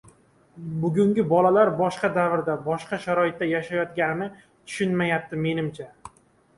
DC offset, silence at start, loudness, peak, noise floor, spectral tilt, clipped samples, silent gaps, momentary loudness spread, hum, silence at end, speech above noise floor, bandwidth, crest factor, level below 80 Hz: under 0.1%; 0.55 s; -24 LUFS; -6 dBFS; -57 dBFS; -7 dB/octave; under 0.1%; none; 14 LU; none; 0.5 s; 34 dB; 11.5 kHz; 18 dB; -62 dBFS